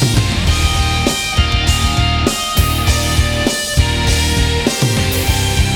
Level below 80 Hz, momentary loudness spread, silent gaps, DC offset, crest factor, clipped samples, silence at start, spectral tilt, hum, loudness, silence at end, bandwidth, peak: -20 dBFS; 1 LU; none; under 0.1%; 14 dB; under 0.1%; 0 s; -4 dB/octave; none; -14 LUFS; 0 s; 19.5 kHz; 0 dBFS